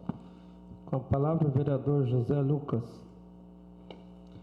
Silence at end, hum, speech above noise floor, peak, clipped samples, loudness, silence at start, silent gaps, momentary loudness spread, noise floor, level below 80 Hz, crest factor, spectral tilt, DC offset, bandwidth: 0 s; none; 23 dB; -16 dBFS; under 0.1%; -30 LUFS; 0 s; none; 23 LU; -51 dBFS; -58 dBFS; 14 dB; -11 dB/octave; under 0.1%; 4.9 kHz